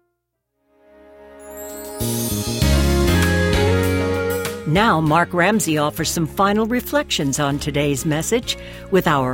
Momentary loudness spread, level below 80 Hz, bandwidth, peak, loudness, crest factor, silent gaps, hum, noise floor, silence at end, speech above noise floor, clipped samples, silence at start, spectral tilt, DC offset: 8 LU; -30 dBFS; 17 kHz; -2 dBFS; -19 LUFS; 18 dB; none; none; -74 dBFS; 0 s; 56 dB; under 0.1%; 1.2 s; -5 dB/octave; under 0.1%